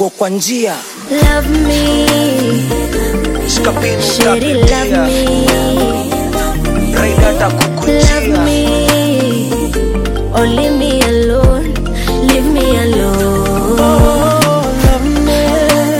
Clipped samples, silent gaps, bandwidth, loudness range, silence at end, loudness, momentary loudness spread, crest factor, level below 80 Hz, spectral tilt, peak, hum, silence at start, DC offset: under 0.1%; none; 17 kHz; 2 LU; 0 s; -12 LUFS; 5 LU; 10 dB; -18 dBFS; -5 dB/octave; 0 dBFS; none; 0 s; under 0.1%